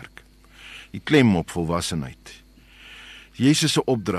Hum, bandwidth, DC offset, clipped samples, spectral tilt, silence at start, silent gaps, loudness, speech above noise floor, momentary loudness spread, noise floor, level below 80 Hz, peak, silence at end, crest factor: none; 13 kHz; under 0.1%; under 0.1%; -5 dB/octave; 0 s; none; -21 LUFS; 28 dB; 24 LU; -49 dBFS; -48 dBFS; -6 dBFS; 0 s; 18 dB